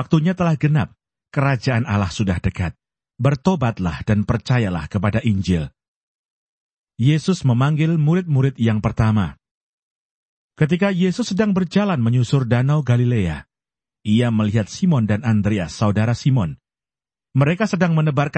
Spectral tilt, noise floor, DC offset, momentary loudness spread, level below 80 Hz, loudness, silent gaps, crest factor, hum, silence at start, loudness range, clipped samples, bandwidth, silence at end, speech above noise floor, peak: -7.5 dB/octave; under -90 dBFS; under 0.1%; 5 LU; -42 dBFS; -19 LUFS; 5.88-6.84 s, 9.51-10.49 s; 16 dB; none; 0 s; 2 LU; under 0.1%; 8.6 kHz; 0 s; over 72 dB; -4 dBFS